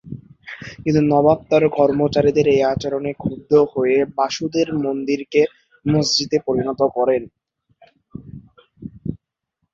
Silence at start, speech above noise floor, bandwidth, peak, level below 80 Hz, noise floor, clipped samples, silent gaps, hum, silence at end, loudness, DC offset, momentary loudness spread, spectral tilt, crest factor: 0.05 s; 57 dB; 7.8 kHz; -2 dBFS; -50 dBFS; -74 dBFS; under 0.1%; none; none; 0.6 s; -18 LUFS; under 0.1%; 19 LU; -5.5 dB/octave; 18 dB